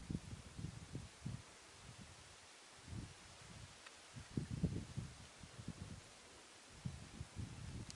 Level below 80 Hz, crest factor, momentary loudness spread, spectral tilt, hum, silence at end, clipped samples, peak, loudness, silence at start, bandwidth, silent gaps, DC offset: -62 dBFS; 24 dB; 12 LU; -5 dB/octave; none; 0 s; under 0.1%; -26 dBFS; -52 LUFS; 0 s; 11.5 kHz; none; under 0.1%